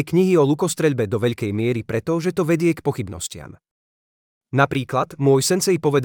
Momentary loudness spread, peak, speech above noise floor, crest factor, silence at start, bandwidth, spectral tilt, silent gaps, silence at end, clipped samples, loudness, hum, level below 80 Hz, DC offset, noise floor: 9 LU; -2 dBFS; over 70 dB; 18 dB; 0 s; 19 kHz; -5.5 dB/octave; 3.71-4.41 s; 0 s; under 0.1%; -20 LUFS; none; -58 dBFS; under 0.1%; under -90 dBFS